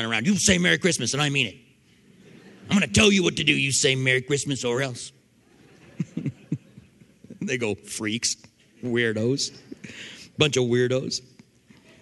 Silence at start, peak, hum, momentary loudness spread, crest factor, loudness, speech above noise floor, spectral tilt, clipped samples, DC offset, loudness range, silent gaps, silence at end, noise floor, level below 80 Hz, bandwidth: 0 s; -2 dBFS; none; 17 LU; 24 dB; -23 LUFS; 33 dB; -3.5 dB/octave; under 0.1%; under 0.1%; 9 LU; none; 0.8 s; -57 dBFS; -52 dBFS; 12 kHz